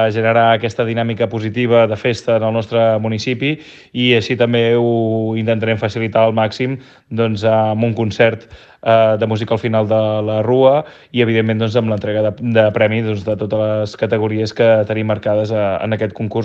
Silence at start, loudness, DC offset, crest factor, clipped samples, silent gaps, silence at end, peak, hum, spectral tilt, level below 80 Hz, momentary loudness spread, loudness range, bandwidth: 0 s; -16 LUFS; under 0.1%; 16 dB; under 0.1%; none; 0 s; 0 dBFS; none; -7 dB/octave; -54 dBFS; 7 LU; 2 LU; 7.8 kHz